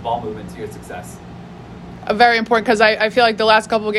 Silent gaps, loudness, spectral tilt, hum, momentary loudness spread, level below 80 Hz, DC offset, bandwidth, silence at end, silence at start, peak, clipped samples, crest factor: none; -15 LUFS; -4 dB/octave; none; 23 LU; -48 dBFS; under 0.1%; 13 kHz; 0 s; 0 s; 0 dBFS; under 0.1%; 18 dB